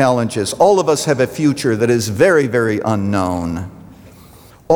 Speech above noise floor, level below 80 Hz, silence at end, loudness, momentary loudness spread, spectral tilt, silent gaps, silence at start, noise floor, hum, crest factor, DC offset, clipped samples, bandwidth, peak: 27 dB; -50 dBFS; 0 s; -15 LUFS; 8 LU; -5.5 dB/octave; none; 0 s; -42 dBFS; none; 14 dB; under 0.1%; under 0.1%; over 20 kHz; -2 dBFS